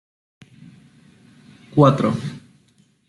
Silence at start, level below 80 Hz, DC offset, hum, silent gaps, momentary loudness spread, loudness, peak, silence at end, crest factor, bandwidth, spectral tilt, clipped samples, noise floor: 1.75 s; -60 dBFS; under 0.1%; none; none; 19 LU; -18 LUFS; -2 dBFS; 0.7 s; 22 dB; 11 kHz; -8.5 dB/octave; under 0.1%; -59 dBFS